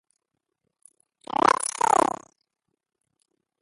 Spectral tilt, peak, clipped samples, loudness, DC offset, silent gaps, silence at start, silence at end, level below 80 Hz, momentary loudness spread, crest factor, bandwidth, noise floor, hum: -2.5 dB/octave; -2 dBFS; under 0.1%; -23 LUFS; under 0.1%; none; 1.45 s; 1.55 s; -66 dBFS; 9 LU; 26 dB; 12 kHz; -81 dBFS; none